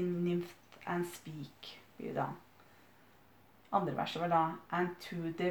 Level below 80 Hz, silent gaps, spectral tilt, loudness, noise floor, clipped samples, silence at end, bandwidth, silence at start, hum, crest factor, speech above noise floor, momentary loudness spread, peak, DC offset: -76 dBFS; none; -6.5 dB/octave; -37 LUFS; -64 dBFS; under 0.1%; 0 s; over 20 kHz; 0 s; none; 20 dB; 28 dB; 16 LU; -18 dBFS; under 0.1%